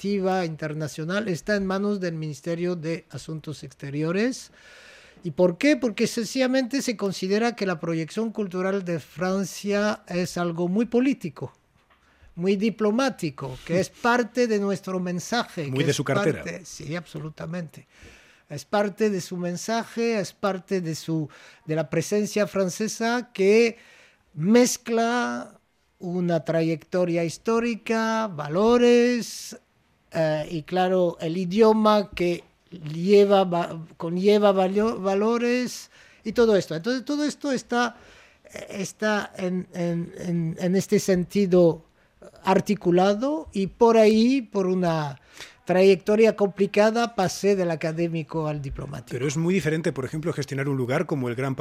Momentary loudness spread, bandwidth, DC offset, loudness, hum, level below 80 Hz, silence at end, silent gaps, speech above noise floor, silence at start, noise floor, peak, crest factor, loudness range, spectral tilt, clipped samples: 15 LU; 15.5 kHz; under 0.1%; -24 LUFS; none; -58 dBFS; 0 s; none; 38 dB; 0 s; -61 dBFS; -6 dBFS; 18 dB; 6 LU; -5.5 dB/octave; under 0.1%